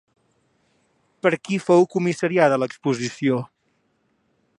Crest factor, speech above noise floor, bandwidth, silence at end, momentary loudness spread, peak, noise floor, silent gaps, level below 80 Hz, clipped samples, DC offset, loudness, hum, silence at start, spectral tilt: 20 dB; 48 dB; 11 kHz; 1.15 s; 7 LU; -2 dBFS; -68 dBFS; none; -70 dBFS; under 0.1%; under 0.1%; -21 LUFS; none; 1.25 s; -6 dB/octave